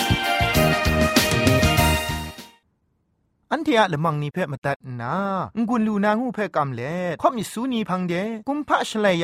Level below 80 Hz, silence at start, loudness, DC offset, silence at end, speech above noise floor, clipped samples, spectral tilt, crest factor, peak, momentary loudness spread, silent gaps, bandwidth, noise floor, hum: -36 dBFS; 0 s; -22 LUFS; under 0.1%; 0 s; 46 dB; under 0.1%; -5 dB/octave; 18 dB; -4 dBFS; 10 LU; 4.58-4.62 s, 4.76-4.80 s; 16 kHz; -69 dBFS; none